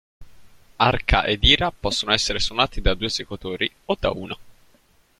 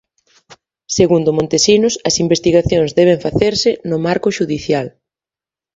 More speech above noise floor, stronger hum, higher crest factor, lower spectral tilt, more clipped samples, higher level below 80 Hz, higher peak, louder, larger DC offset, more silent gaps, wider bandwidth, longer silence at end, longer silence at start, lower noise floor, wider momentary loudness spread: second, 37 dB vs 76 dB; neither; first, 22 dB vs 16 dB; about the same, -3.5 dB/octave vs -4.5 dB/octave; neither; first, -32 dBFS vs -42 dBFS; about the same, 0 dBFS vs 0 dBFS; second, -21 LUFS vs -14 LUFS; neither; neither; first, 13.5 kHz vs 8 kHz; second, 0.7 s vs 0.85 s; second, 0.2 s vs 0.9 s; second, -58 dBFS vs -90 dBFS; first, 12 LU vs 7 LU